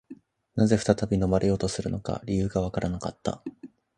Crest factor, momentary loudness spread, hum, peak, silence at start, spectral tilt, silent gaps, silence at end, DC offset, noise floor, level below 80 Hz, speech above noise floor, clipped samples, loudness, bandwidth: 22 dB; 10 LU; none; -6 dBFS; 0.1 s; -6.5 dB/octave; none; 0.3 s; under 0.1%; -49 dBFS; -44 dBFS; 24 dB; under 0.1%; -27 LUFS; 11 kHz